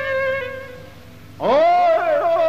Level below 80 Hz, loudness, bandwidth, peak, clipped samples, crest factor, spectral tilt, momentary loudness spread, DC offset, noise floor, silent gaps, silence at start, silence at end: -54 dBFS; -17 LUFS; 14 kHz; -8 dBFS; under 0.1%; 12 dB; -5.5 dB/octave; 17 LU; 0.6%; -41 dBFS; none; 0 s; 0 s